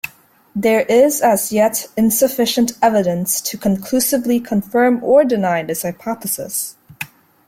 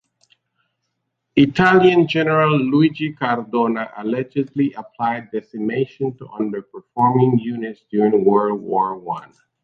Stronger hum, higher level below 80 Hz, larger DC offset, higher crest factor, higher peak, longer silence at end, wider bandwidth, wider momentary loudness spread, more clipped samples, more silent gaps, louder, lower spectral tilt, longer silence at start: neither; about the same, -56 dBFS vs -58 dBFS; neither; about the same, 14 dB vs 18 dB; about the same, -2 dBFS vs -2 dBFS; about the same, 0.4 s vs 0.4 s; first, 16.5 kHz vs 7.6 kHz; about the same, 11 LU vs 12 LU; neither; neither; about the same, -16 LUFS vs -18 LUFS; second, -4 dB/octave vs -8 dB/octave; second, 0.05 s vs 1.35 s